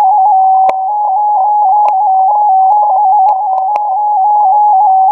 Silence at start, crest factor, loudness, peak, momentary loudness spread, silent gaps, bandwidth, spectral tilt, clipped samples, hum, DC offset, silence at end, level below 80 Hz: 0 s; 8 dB; -9 LUFS; 0 dBFS; 5 LU; none; 2.9 kHz; -3.5 dB/octave; under 0.1%; none; under 0.1%; 0 s; -70 dBFS